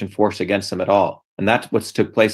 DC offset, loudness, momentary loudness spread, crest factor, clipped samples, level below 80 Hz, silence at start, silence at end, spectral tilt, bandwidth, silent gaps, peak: under 0.1%; -20 LUFS; 5 LU; 18 dB; under 0.1%; -60 dBFS; 0 s; 0 s; -5.5 dB/octave; 12.5 kHz; 1.24-1.37 s; 0 dBFS